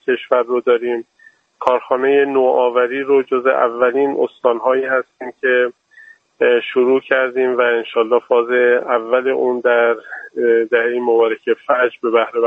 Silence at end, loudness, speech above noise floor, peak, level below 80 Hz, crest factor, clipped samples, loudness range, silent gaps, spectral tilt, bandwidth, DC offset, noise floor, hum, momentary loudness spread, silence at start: 0 s; -16 LUFS; 30 dB; 0 dBFS; -68 dBFS; 16 dB; under 0.1%; 2 LU; none; -6 dB/octave; 3.9 kHz; under 0.1%; -45 dBFS; none; 5 LU; 0.05 s